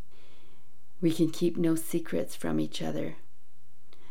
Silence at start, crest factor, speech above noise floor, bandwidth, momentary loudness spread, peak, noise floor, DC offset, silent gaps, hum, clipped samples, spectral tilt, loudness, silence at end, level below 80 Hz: 1 s; 18 dB; 37 dB; 17 kHz; 7 LU; -16 dBFS; -66 dBFS; 3%; none; none; under 0.1%; -6 dB/octave; -31 LUFS; 0.95 s; -68 dBFS